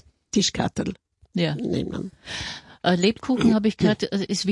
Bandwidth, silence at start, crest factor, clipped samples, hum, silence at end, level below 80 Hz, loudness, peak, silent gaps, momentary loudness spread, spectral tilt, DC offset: 11.5 kHz; 0.35 s; 18 dB; under 0.1%; none; 0 s; -52 dBFS; -24 LUFS; -6 dBFS; none; 12 LU; -5 dB/octave; under 0.1%